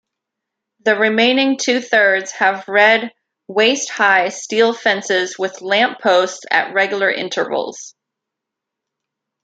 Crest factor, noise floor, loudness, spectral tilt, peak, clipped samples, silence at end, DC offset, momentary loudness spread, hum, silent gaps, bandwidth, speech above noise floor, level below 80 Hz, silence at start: 16 dB; -82 dBFS; -15 LUFS; -2 dB/octave; -2 dBFS; under 0.1%; 1.55 s; under 0.1%; 9 LU; none; none; 9.2 kHz; 66 dB; -72 dBFS; 0.85 s